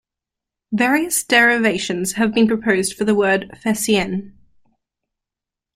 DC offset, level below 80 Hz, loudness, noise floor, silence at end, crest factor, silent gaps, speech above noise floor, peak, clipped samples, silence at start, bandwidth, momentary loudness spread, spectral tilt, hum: under 0.1%; -54 dBFS; -17 LUFS; -87 dBFS; 1.45 s; 18 dB; none; 69 dB; -2 dBFS; under 0.1%; 0.7 s; 16 kHz; 9 LU; -3.5 dB/octave; none